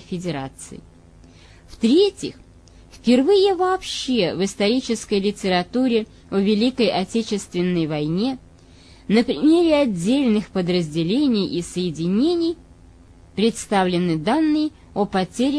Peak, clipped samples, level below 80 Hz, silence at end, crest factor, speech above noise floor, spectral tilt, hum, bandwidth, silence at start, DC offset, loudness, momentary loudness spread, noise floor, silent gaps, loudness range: -4 dBFS; under 0.1%; -50 dBFS; 0 s; 16 dB; 27 dB; -5.5 dB/octave; none; 11 kHz; 0 s; under 0.1%; -20 LUFS; 9 LU; -47 dBFS; none; 3 LU